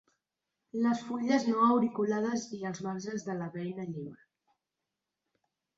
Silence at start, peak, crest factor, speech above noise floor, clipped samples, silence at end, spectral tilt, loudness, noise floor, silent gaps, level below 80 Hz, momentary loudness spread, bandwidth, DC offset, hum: 0.75 s; -14 dBFS; 20 dB; 57 dB; under 0.1%; 1.6 s; -6 dB/octave; -32 LUFS; -88 dBFS; none; -76 dBFS; 14 LU; 7.8 kHz; under 0.1%; none